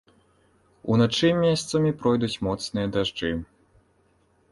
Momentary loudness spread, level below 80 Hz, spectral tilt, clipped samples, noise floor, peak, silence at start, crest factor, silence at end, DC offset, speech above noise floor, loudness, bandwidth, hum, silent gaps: 9 LU; -50 dBFS; -5.5 dB/octave; under 0.1%; -64 dBFS; -8 dBFS; 0.85 s; 18 dB; 1.1 s; under 0.1%; 41 dB; -24 LUFS; 11.5 kHz; none; none